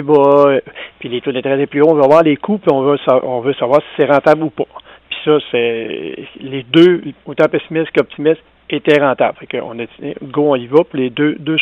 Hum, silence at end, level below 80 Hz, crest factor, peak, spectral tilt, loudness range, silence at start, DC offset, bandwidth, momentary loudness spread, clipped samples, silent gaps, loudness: none; 0 s; -58 dBFS; 14 dB; 0 dBFS; -7.5 dB/octave; 3 LU; 0 s; under 0.1%; 7.2 kHz; 16 LU; under 0.1%; none; -14 LUFS